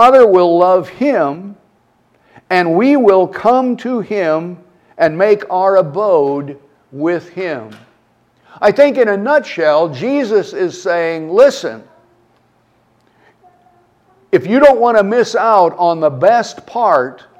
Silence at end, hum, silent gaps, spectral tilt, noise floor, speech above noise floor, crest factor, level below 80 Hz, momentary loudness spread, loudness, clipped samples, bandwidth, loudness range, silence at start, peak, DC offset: 0.25 s; none; none; -6 dB/octave; -55 dBFS; 43 dB; 14 dB; -58 dBFS; 11 LU; -13 LUFS; under 0.1%; 9.8 kHz; 5 LU; 0 s; 0 dBFS; under 0.1%